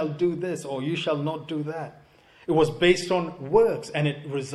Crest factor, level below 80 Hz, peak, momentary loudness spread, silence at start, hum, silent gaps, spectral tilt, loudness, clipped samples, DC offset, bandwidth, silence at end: 20 dB; -54 dBFS; -6 dBFS; 11 LU; 0 s; none; none; -6 dB/octave; -25 LUFS; under 0.1%; under 0.1%; 12 kHz; 0 s